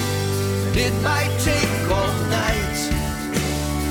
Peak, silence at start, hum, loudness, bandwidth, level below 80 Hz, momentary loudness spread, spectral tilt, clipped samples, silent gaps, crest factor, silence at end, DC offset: -8 dBFS; 0 s; none; -21 LUFS; 19.5 kHz; -32 dBFS; 4 LU; -4.5 dB/octave; under 0.1%; none; 12 dB; 0 s; under 0.1%